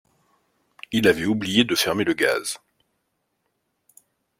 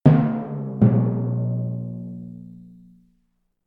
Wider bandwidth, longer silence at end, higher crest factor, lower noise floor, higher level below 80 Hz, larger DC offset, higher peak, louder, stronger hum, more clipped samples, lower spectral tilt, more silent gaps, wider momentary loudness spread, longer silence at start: first, 16.5 kHz vs 3.9 kHz; first, 1.85 s vs 1 s; about the same, 22 dB vs 20 dB; first, -74 dBFS vs -69 dBFS; second, -58 dBFS vs -52 dBFS; neither; about the same, -2 dBFS vs -2 dBFS; about the same, -21 LUFS vs -22 LUFS; second, none vs 60 Hz at -35 dBFS; neither; second, -3.5 dB/octave vs -12 dB/octave; neither; second, 8 LU vs 20 LU; first, 0.9 s vs 0.05 s